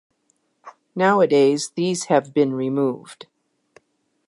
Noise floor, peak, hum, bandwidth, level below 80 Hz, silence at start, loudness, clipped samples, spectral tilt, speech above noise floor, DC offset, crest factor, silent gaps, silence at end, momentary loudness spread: -68 dBFS; -4 dBFS; none; 11.5 kHz; -76 dBFS; 0.65 s; -19 LUFS; under 0.1%; -5 dB/octave; 49 dB; under 0.1%; 18 dB; none; 1.15 s; 15 LU